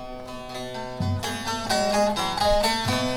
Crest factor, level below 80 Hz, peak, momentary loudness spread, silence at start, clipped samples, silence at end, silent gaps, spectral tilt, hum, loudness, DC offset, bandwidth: 16 dB; -40 dBFS; -8 dBFS; 13 LU; 0 s; under 0.1%; 0 s; none; -4 dB/octave; none; -25 LUFS; 0.4%; 18 kHz